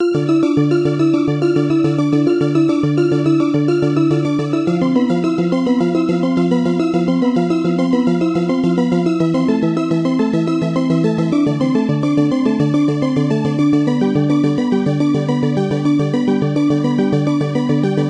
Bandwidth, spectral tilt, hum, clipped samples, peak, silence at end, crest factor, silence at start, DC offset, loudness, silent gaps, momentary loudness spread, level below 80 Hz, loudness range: 9.6 kHz; -8 dB/octave; none; under 0.1%; -2 dBFS; 0 s; 12 dB; 0 s; under 0.1%; -16 LUFS; none; 2 LU; -54 dBFS; 1 LU